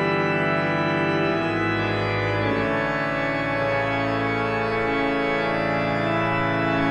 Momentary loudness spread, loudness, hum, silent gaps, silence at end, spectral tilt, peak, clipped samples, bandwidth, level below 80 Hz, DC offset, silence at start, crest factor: 2 LU; -23 LUFS; none; none; 0 s; -7 dB/octave; -8 dBFS; under 0.1%; 10 kHz; -46 dBFS; under 0.1%; 0 s; 14 dB